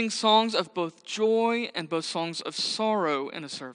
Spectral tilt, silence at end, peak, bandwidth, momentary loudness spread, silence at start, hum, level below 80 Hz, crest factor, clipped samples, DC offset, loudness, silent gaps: -3.5 dB/octave; 0 s; -8 dBFS; 10 kHz; 11 LU; 0 s; none; -82 dBFS; 18 dB; under 0.1%; under 0.1%; -27 LUFS; none